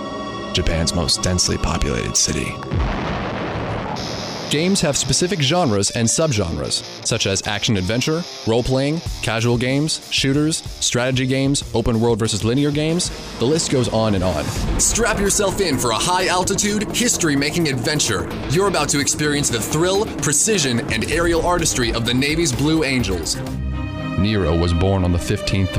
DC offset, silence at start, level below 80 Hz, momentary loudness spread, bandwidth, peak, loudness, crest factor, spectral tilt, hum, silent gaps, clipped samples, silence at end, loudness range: under 0.1%; 0 s; -32 dBFS; 7 LU; 16 kHz; -2 dBFS; -19 LUFS; 16 dB; -4 dB/octave; none; none; under 0.1%; 0 s; 2 LU